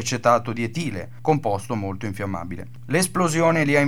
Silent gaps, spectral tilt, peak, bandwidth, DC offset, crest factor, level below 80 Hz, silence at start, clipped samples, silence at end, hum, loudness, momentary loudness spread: none; -5 dB/octave; -6 dBFS; 18.5 kHz; 1%; 18 dB; -56 dBFS; 0 s; under 0.1%; 0 s; none; -23 LUFS; 11 LU